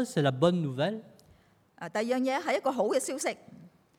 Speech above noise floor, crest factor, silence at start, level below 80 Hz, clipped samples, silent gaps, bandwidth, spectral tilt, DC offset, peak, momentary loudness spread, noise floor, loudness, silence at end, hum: 33 dB; 20 dB; 0 s; -74 dBFS; under 0.1%; none; 17 kHz; -5.5 dB/octave; under 0.1%; -10 dBFS; 11 LU; -62 dBFS; -29 LUFS; 0.3 s; none